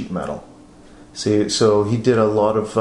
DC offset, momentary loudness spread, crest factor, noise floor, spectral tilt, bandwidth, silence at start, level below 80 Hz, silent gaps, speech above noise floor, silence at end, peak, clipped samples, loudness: under 0.1%; 14 LU; 16 dB; -44 dBFS; -5.5 dB/octave; 11 kHz; 0 s; -50 dBFS; none; 26 dB; 0 s; -4 dBFS; under 0.1%; -18 LUFS